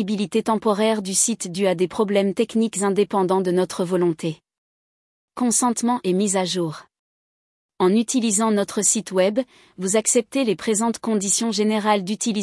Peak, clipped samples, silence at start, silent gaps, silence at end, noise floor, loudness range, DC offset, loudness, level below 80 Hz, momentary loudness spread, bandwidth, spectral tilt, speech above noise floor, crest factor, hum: -6 dBFS; under 0.1%; 0 s; 4.58-5.28 s, 6.99-7.69 s; 0 s; under -90 dBFS; 3 LU; under 0.1%; -21 LUFS; -66 dBFS; 6 LU; 12 kHz; -4 dB/octave; over 69 dB; 16 dB; none